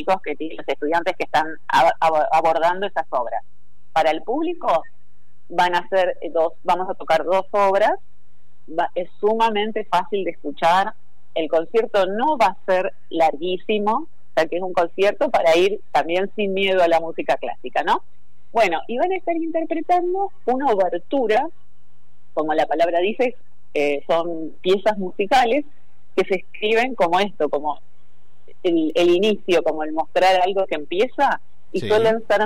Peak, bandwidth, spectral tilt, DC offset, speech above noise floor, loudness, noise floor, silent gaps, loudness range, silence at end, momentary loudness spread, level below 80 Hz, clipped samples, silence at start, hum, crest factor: -8 dBFS; 15.5 kHz; -5 dB/octave; 4%; 43 dB; -21 LUFS; -63 dBFS; none; 3 LU; 0 s; 8 LU; -58 dBFS; under 0.1%; 0 s; none; 12 dB